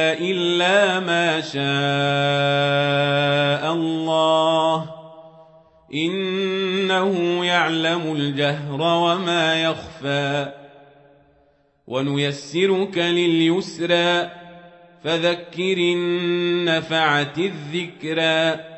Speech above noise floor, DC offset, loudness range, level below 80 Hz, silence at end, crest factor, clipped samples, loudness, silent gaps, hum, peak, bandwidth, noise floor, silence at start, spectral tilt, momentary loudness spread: 40 dB; under 0.1%; 4 LU; -64 dBFS; 0 s; 16 dB; under 0.1%; -20 LUFS; none; none; -6 dBFS; 8.4 kHz; -60 dBFS; 0 s; -5 dB/octave; 7 LU